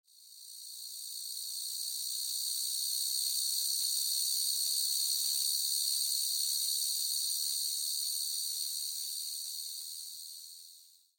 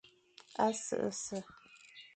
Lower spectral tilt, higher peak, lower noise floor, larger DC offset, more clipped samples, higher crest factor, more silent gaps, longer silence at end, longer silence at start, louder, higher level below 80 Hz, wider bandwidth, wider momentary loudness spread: second, 6 dB/octave vs -3.5 dB/octave; about the same, -18 dBFS vs -18 dBFS; about the same, -59 dBFS vs -62 dBFS; neither; neither; about the same, 18 dB vs 22 dB; neither; first, 0.3 s vs 0.1 s; first, 0.2 s vs 0.05 s; first, -31 LUFS vs -37 LUFS; second, under -90 dBFS vs -76 dBFS; first, 17 kHz vs 9.4 kHz; second, 13 LU vs 21 LU